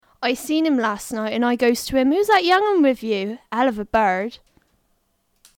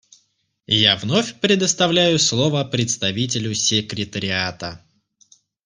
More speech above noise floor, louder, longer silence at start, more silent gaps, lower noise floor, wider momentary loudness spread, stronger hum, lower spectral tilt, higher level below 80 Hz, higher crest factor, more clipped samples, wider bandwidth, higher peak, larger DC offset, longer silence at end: about the same, 48 dB vs 46 dB; about the same, -20 LUFS vs -18 LUFS; second, 0.2 s vs 0.7 s; neither; about the same, -67 dBFS vs -66 dBFS; about the same, 9 LU vs 9 LU; neither; about the same, -4 dB/octave vs -3 dB/octave; first, -52 dBFS vs -58 dBFS; second, 14 dB vs 20 dB; neither; first, 18.5 kHz vs 10.5 kHz; second, -6 dBFS vs -2 dBFS; neither; first, 1.2 s vs 0.9 s